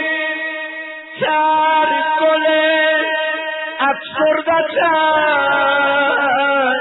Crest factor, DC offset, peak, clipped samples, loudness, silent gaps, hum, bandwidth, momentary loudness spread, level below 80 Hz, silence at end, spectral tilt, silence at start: 12 dB; under 0.1%; -4 dBFS; under 0.1%; -15 LUFS; none; none; 4.1 kHz; 8 LU; -62 dBFS; 0 s; -8.5 dB/octave; 0 s